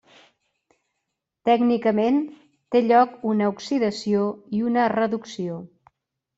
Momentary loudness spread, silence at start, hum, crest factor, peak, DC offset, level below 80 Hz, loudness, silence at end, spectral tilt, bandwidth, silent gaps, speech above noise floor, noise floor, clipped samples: 12 LU; 1.45 s; none; 18 dB; -4 dBFS; under 0.1%; -66 dBFS; -22 LUFS; 0.7 s; -6.5 dB/octave; 8 kHz; none; 59 dB; -80 dBFS; under 0.1%